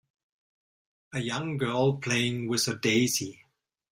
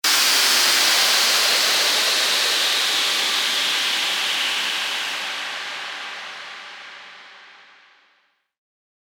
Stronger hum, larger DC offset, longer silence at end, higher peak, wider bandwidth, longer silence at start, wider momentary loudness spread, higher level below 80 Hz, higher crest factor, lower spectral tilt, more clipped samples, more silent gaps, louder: neither; neither; second, 0.55 s vs 1.6 s; second, -12 dBFS vs -6 dBFS; second, 16 kHz vs over 20 kHz; first, 1.1 s vs 0.05 s; second, 9 LU vs 18 LU; first, -66 dBFS vs -84 dBFS; about the same, 18 dB vs 16 dB; first, -4 dB/octave vs 2.5 dB/octave; neither; neither; second, -28 LUFS vs -17 LUFS